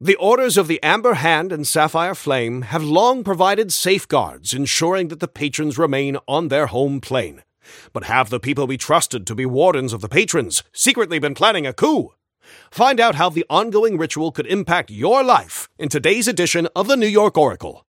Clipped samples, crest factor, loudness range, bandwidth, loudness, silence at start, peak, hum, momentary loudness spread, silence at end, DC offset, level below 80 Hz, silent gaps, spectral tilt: under 0.1%; 18 dB; 3 LU; 17 kHz; -17 LUFS; 0 s; 0 dBFS; none; 8 LU; 0.15 s; under 0.1%; -56 dBFS; none; -3.5 dB/octave